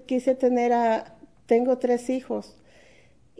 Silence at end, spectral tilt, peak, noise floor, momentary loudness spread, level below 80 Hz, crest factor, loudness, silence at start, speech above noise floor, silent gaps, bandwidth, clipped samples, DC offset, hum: 0.95 s; -5.5 dB/octave; -8 dBFS; -58 dBFS; 8 LU; -66 dBFS; 16 dB; -24 LUFS; 0.1 s; 35 dB; none; 11 kHz; under 0.1%; 0.1%; none